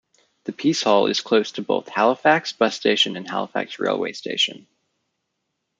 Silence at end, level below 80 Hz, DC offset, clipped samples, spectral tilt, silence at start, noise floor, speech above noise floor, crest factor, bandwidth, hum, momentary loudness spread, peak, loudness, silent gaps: 1.2 s; -70 dBFS; under 0.1%; under 0.1%; -3.5 dB/octave; 0.45 s; -77 dBFS; 56 dB; 20 dB; 9.4 kHz; none; 8 LU; -2 dBFS; -21 LUFS; none